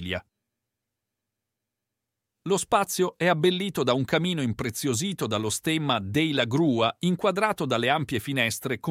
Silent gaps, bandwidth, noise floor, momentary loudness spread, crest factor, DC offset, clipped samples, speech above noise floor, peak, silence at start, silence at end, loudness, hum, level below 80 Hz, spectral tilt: none; 16.5 kHz; -85 dBFS; 5 LU; 20 dB; under 0.1%; under 0.1%; 60 dB; -8 dBFS; 0 s; 0 s; -25 LUFS; none; -62 dBFS; -4.5 dB/octave